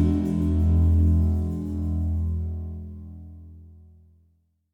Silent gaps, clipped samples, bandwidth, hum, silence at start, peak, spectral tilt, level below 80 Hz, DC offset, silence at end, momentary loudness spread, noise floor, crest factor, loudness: none; under 0.1%; 3.2 kHz; none; 0 s; -10 dBFS; -10.5 dB/octave; -30 dBFS; under 0.1%; 1.05 s; 22 LU; -66 dBFS; 14 dB; -24 LUFS